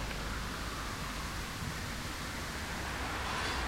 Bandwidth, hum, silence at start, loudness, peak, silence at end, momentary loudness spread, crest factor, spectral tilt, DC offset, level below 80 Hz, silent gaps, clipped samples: 16 kHz; none; 0 s; -38 LUFS; -24 dBFS; 0 s; 3 LU; 14 dB; -3.5 dB/octave; under 0.1%; -44 dBFS; none; under 0.1%